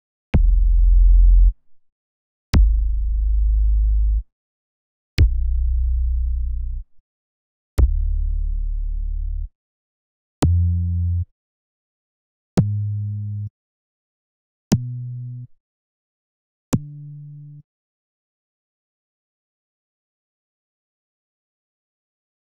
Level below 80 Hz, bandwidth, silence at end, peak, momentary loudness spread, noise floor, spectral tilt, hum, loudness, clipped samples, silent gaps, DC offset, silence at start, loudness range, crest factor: -22 dBFS; 6.2 kHz; 4.9 s; -6 dBFS; 16 LU; -38 dBFS; -8 dB/octave; none; -22 LUFS; under 0.1%; 1.92-2.53 s, 4.32-5.17 s, 7.00-7.77 s, 9.55-10.42 s, 11.31-12.57 s, 13.50-14.71 s, 15.60-16.72 s; 0.2%; 0.35 s; 14 LU; 16 dB